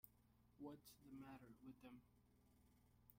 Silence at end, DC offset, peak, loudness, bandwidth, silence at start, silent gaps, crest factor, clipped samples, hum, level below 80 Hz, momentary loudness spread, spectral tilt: 0 s; under 0.1%; -42 dBFS; -63 LUFS; 16 kHz; 0.05 s; none; 22 dB; under 0.1%; 60 Hz at -80 dBFS; -82 dBFS; 7 LU; -6 dB/octave